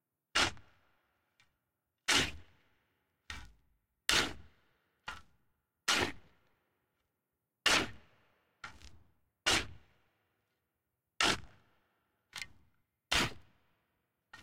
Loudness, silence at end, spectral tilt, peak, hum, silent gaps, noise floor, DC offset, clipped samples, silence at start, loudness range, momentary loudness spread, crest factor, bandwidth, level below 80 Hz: -32 LUFS; 0.05 s; -1.5 dB/octave; -10 dBFS; none; none; -87 dBFS; under 0.1%; under 0.1%; 0.35 s; 4 LU; 20 LU; 30 dB; 16 kHz; -58 dBFS